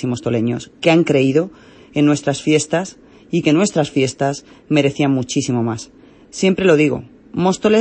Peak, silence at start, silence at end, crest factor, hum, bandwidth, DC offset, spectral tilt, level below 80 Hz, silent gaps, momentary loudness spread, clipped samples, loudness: 0 dBFS; 0 s; 0 s; 16 dB; none; 8.8 kHz; under 0.1%; -5.5 dB/octave; -52 dBFS; none; 13 LU; under 0.1%; -17 LUFS